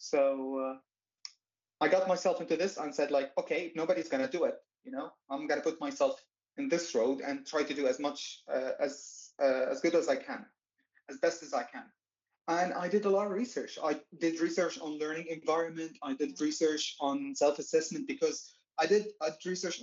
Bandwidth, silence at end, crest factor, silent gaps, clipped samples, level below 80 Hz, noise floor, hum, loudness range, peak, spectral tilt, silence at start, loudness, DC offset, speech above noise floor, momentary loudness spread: 8 kHz; 0 s; 18 dB; none; under 0.1%; -86 dBFS; -76 dBFS; none; 2 LU; -16 dBFS; -3.5 dB/octave; 0 s; -33 LUFS; under 0.1%; 44 dB; 13 LU